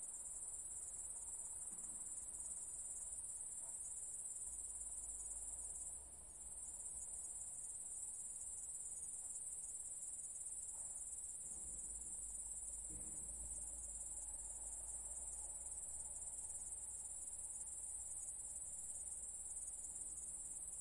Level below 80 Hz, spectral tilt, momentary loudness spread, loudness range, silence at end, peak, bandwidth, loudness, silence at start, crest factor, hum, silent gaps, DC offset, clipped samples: -66 dBFS; -1.5 dB/octave; 1 LU; 1 LU; 0 s; -34 dBFS; 11.5 kHz; -47 LUFS; 0 s; 16 dB; none; none; under 0.1%; under 0.1%